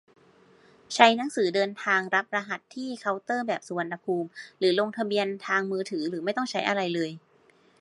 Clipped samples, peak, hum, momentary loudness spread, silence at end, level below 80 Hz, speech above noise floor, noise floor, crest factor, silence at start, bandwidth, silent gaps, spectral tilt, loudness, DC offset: under 0.1%; 0 dBFS; none; 12 LU; 0.65 s; -82 dBFS; 34 dB; -61 dBFS; 26 dB; 0.9 s; 11.5 kHz; none; -4 dB/octave; -27 LUFS; under 0.1%